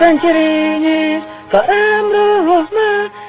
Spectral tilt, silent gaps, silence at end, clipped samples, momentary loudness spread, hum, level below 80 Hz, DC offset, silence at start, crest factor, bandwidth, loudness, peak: -8.5 dB/octave; none; 0 s; under 0.1%; 4 LU; none; -52 dBFS; under 0.1%; 0 s; 12 dB; 4 kHz; -13 LUFS; 0 dBFS